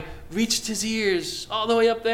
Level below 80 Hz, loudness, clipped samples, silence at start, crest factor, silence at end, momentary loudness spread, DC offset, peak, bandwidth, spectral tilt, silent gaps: -48 dBFS; -24 LUFS; under 0.1%; 0 s; 14 dB; 0 s; 7 LU; under 0.1%; -10 dBFS; 17.5 kHz; -2.5 dB/octave; none